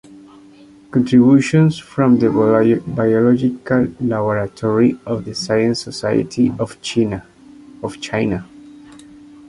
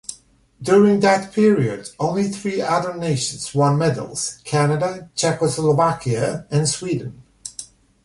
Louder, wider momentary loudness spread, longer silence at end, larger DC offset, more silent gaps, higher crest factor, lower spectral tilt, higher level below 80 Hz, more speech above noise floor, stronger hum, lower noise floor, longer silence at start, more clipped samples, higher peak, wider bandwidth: first, -16 LUFS vs -19 LUFS; second, 11 LU vs 14 LU; first, 0.9 s vs 0.4 s; neither; neither; about the same, 14 dB vs 16 dB; first, -7 dB/octave vs -5.5 dB/octave; first, -48 dBFS vs -54 dBFS; about the same, 28 dB vs 29 dB; neither; second, -44 dBFS vs -48 dBFS; about the same, 0.1 s vs 0.1 s; neither; about the same, -2 dBFS vs -4 dBFS; about the same, 11 kHz vs 11.5 kHz